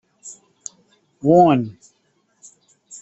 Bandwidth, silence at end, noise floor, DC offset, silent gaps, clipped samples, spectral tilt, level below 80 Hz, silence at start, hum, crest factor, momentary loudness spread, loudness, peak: 8.2 kHz; 0.05 s; -65 dBFS; under 0.1%; none; under 0.1%; -7 dB/octave; -62 dBFS; 0.25 s; none; 18 dB; 26 LU; -16 LUFS; -2 dBFS